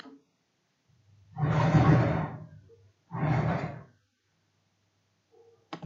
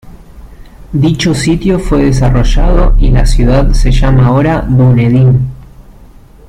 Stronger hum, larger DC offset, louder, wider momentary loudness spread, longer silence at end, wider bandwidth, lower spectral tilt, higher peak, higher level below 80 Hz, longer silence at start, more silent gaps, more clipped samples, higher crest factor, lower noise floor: neither; neither; second, -27 LUFS vs -10 LUFS; first, 24 LU vs 4 LU; second, 0 s vs 0.7 s; second, 7.2 kHz vs 10.5 kHz; first, -8.5 dB/octave vs -7 dB/octave; second, -12 dBFS vs 0 dBFS; second, -52 dBFS vs -12 dBFS; about the same, 0.05 s vs 0.05 s; neither; neither; first, 20 dB vs 8 dB; first, -75 dBFS vs -35 dBFS